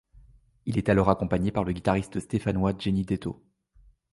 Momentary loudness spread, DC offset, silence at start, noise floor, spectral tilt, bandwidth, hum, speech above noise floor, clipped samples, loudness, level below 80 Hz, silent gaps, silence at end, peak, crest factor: 9 LU; under 0.1%; 0.65 s; -59 dBFS; -7.5 dB/octave; 11.5 kHz; none; 33 dB; under 0.1%; -27 LUFS; -44 dBFS; none; 0.8 s; -4 dBFS; 22 dB